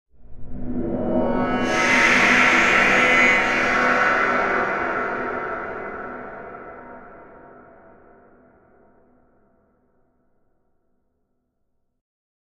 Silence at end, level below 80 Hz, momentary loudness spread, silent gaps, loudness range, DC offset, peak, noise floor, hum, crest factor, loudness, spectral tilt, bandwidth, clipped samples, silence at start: 5.1 s; -42 dBFS; 22 LU; none; 19 LU; under 0.1%; -4 dBFS; -71 dBFS; none; 20 dB; -18 LUFS; -3.5 dB/octave; 14.5 kHz; under 0.1%; 0.2 s